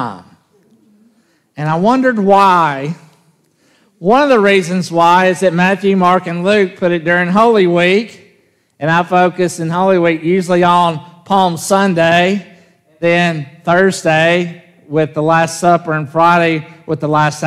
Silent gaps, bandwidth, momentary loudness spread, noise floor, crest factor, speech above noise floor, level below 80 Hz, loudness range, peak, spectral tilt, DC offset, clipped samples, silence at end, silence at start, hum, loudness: none; 14 kHz; 10 LU; -55 dBFS; 12 dB; 43 dB; -56 dBFS; 3 LU; 0 dBFS; -5.5 dB/octave; under 0.1%; under 0.1%; 0 s; 0 s; none; -12 LUFS